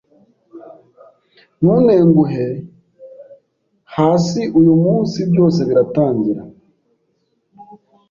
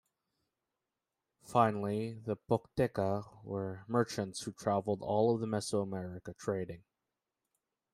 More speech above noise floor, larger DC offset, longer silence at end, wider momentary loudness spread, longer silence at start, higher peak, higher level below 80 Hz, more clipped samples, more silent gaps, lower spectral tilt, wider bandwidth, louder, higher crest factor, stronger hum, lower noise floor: about the same, 52 dB vs 55 dB; neither; second, 0.45 s vs 1.15 s; about the same, 11 LU vs 11 LU; second, 0.55 s vs 1.45 s; first, -2 dBFS vs -12 dBFS; first, -52 dBFS vs -68 dBFS; neither; neither; first, -8.5 dB/octave vs -6 dB/octave; second, 7.4 kHz vs 15.5 kHz; first, -14 LUFS vs -35 LUFS; second, 14 dB vs 24 dB; neither; second, -65 dBFS vs -89 dBFS